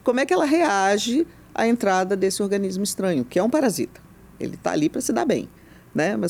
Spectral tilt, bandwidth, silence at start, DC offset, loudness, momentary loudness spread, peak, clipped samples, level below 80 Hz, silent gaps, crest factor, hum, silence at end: -4.5 dB/octave; 19 kHz; 0.05 s; under 0.1%; -22 LUFS; 10 LU; -8 dBFS; under 0.1%; -56 dBFS; none; 14 dB; none; 0 s